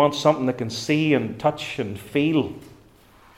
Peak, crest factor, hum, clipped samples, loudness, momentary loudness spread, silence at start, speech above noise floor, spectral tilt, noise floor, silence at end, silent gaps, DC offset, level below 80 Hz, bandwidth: -4 dBFS; 20 dB; none; under 0.1%; -23 LUFS; 9 LU; 0 s; 30 dB; -5.5 dB/octave; -52 dBFS; 0.7 s; none; under 0.1%; -58 dBFS; 15.5 kHz